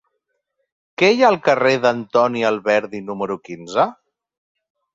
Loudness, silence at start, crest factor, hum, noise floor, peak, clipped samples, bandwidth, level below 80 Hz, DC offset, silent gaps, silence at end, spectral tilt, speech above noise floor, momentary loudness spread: -18 LUFS; 1 s; 18 dB; none; -74 dBFS; -2 dBFS; under 0.1%; 7.8 kHz; -64 dBFS; under 0.1%; none; 1 s; -5 dB/octave; 57 dB; 12 LU